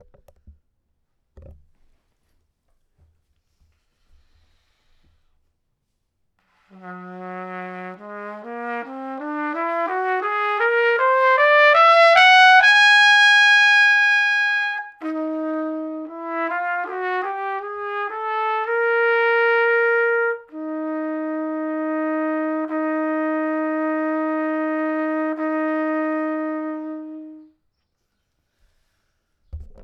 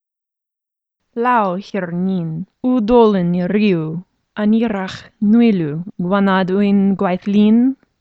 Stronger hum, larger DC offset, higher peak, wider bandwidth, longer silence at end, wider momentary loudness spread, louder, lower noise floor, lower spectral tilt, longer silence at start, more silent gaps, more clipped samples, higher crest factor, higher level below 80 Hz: neither; neither; about the same, 0 dBFS vs 0 dBFS; first, 10.5 kHz vs 6.4 kHz; second, 0 s vs 0.25 s; first, 21 LU vs 11 LU; about the same, -18 LUFS vs -16 LUFS; second, -73 dBFS vs -84 dBFS; second, -2.5 dB/octave vs -8.5 dB/octave; first, 1.35 s vs 1.15 s; neither; neither; about the same, 20 dB vs 16 dB; second, -56 dBFS vs -48 dBFS